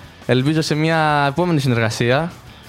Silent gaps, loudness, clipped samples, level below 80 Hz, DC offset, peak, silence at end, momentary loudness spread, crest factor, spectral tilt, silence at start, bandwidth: none; -17 LUFS; under 0.1%; -48 dBFS; under 0.1%; -2 dBFS; 0 s; 4 LU; 16 dB; -6 dB/octave; 0 s; 16 kHz